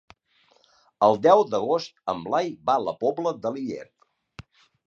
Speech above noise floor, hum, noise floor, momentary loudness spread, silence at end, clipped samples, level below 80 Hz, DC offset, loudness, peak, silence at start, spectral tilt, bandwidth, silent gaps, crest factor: 40 dB; none; -63 dBFS; 13 LU; 0.45 s; under 0.1%; -66 dBFS; under 0.1%; -24 LUFS; -4 dBFS; 1 s; -6 dB/octave; 7.4 kHz; none; 20 dB